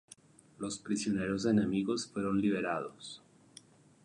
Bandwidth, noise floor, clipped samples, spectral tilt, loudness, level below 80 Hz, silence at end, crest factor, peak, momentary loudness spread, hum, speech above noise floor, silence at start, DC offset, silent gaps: 11 kHz; -59 dBFS; under 0.1%; -5.5 dB/octave; -33 LUFS; -64 dBFS; 0.9 s; 18 dB; -18 dBFS; 15 LU; none; 26 dB; 0.6 s; under 0.1%; none